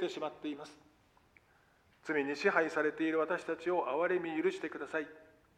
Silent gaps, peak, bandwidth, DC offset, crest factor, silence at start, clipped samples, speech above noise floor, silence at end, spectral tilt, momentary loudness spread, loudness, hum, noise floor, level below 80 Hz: none; -14 dBFS; 10.5 kHz; under 0.1%; 22 dB; 0 s; under 0.1%; 33 dB; 0.35 s; -5 dB/octave; 12 LU; -35 LUFS; none; -68 dBFS; -78 dBFS